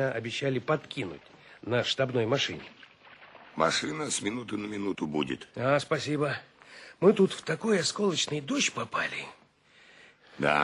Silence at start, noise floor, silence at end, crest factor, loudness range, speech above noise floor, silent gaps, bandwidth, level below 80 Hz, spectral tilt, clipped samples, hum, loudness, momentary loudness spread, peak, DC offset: 0 s; -60 dBFS; 0 s; 22 dB; 3 LU; 31 dB; none; 11 kHz; -66 dBFS; -4 dB/octave; under 0.1%; none; -29 LUFS; 12 LU; -8 dBFS; under 0.1%